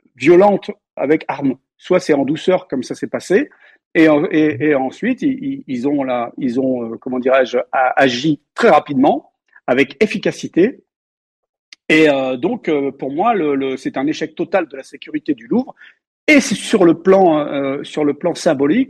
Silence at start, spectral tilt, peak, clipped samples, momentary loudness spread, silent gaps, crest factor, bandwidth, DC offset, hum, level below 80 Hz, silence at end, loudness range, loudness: 0.2 s; -5.5 dB/octave; -2 dBFS; under 0.1%; 11 LU; 0.93-0.97 s, 3.86-3.91 s, 10.96-11.43 s, 11.49-11.72 s, 16.07-16.27 s; 14 dB; 12 kHz; under 0.1%; none; -60 dBFS; 0.05 s; 3 LU; -16 LUFS